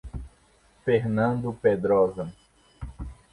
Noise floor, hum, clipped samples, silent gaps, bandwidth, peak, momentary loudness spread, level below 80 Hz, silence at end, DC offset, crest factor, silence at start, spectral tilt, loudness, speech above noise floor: -60 dBFS; none; under 0.1%; none; 11 kHz; -8 dBFS; 20 LU; -46 dBFS; 0.2 s; under 0.1%; 18 dB; 0.05 s; -8.5 dB/octave; -25 LUFS; 37 dB